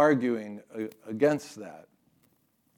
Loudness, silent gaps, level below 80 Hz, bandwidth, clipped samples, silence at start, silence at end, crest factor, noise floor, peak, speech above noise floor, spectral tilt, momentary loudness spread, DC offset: -29 LUFS; none; -86 dBFS; 17 kHz; under 0.1%; 0 s; 0.95 s; 20 dB; -70 dBFS; -10 dBFS; 42 dB; -6.5 dB/octave; 18 LU; under 0.1%